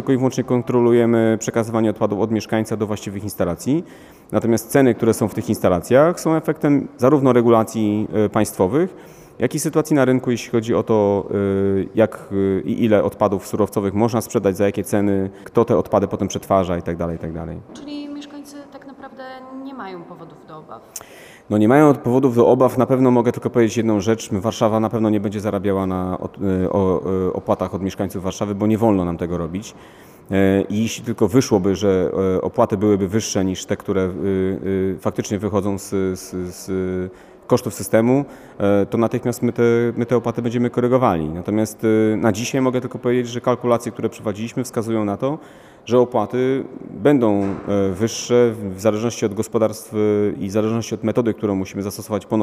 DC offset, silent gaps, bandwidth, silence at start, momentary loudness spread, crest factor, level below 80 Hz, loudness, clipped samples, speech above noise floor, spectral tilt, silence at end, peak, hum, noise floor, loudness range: under 0.1%; none; 15.5 kHz; 0 s; 12 LU; 16 dB; -52 dBFS; -19 LUFS; under 0.1%; 20 dB; -6.5 dB/octave; 0 s; -2 dBFS; none; -38 dBFS; 5 LU